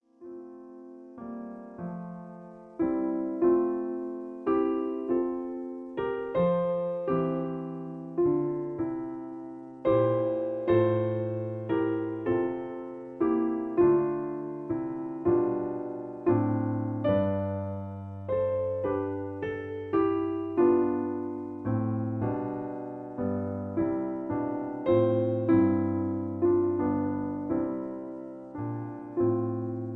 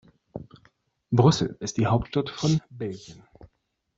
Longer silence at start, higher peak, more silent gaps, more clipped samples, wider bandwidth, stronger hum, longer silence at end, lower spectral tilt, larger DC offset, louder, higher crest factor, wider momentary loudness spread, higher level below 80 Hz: second, 0.2 s vs 0.35 s; second, -12 dBFS vs -4 dBFS; neither; neither; second, 4 kHz vs 7.8 kHz; neither; second, 0 s vs 0.85 s; first, -11 dB/octave vs -6.5 dB/octave; neither; second, -29 LUFS vs -25 LUFS; second, 16 dB vs 22 dB; second, 14 LU vs 22 LU; second, -60 dBFS vs -52 dBFS